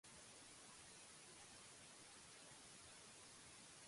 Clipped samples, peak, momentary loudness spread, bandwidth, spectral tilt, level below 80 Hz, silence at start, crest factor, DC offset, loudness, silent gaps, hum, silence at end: under 0.1%; -48 dBFS; 0 LU; 11.5 kHz; -1.5 dB/octave; -84 dBFS; 0.05 s; 14 dB; under 0.1%; -60 LUFS; none; none; 0 s